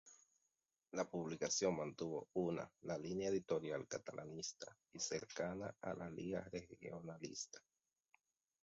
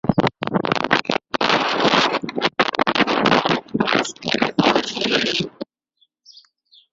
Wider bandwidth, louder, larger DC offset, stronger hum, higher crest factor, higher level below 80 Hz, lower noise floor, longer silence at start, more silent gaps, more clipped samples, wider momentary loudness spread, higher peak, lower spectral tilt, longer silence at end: about the same, 7.6 kHz vs 7.8 kHz; second, -45 LUFS vs -19 LUFS; neither; neither; about the same, 22 dB vs 20 dB; second, -76 dBFS vs -52 dBFS; first, -89 dBFS vs -65 dBFS; about the same, 0.05 s vs 0.05 s; neither; neither; first, 11 LU vs 6 LU; second, -26 dBFS vs 0 dBFS; about the same, -4.5 dB/octave vs -4.5 dB/octave; second, 1.05 s vs 1.3 s